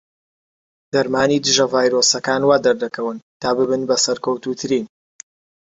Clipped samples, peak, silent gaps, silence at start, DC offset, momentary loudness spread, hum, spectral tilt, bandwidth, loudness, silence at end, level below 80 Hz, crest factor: under 0.1%; -2 dBFS; 3.22-3.40 s; 0.95 s; under 0.1%; 9 LU; none; -3 dB/octave; 8 kHz; -18 LUFS; 0.75 s; -58 dBFS; 18 dB